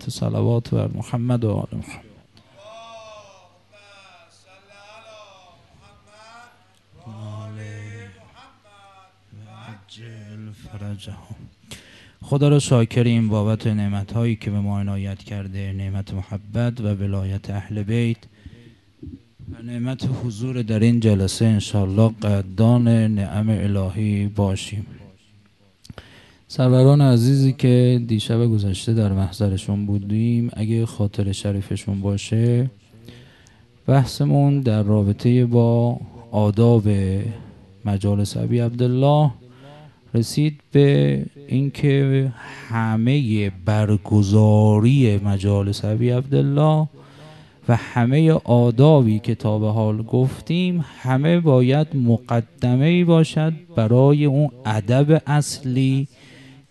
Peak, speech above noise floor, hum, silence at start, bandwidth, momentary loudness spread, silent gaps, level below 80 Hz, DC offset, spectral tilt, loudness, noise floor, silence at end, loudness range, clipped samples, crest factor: -2 dBFS; 37 dB; none; 0 s; 12.5 kHz; 16 LU; none; -42 dBFS; under 0.1%; -7.5 dB/octave; -19 LUFS; -55 dBFS; 0.65 s; 12 LU; under 0.1%; 18 dB